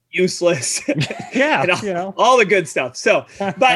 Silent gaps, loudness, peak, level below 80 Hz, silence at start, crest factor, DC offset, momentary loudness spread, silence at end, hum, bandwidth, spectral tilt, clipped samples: none; -17 LUFS; -2 dBFS; -60 dBFS; 0.15 s; 16 dB; under 0.1%; 8 LU; 0 s; none; 12.5 kHz; -3.5 dB/octave; under 0.1%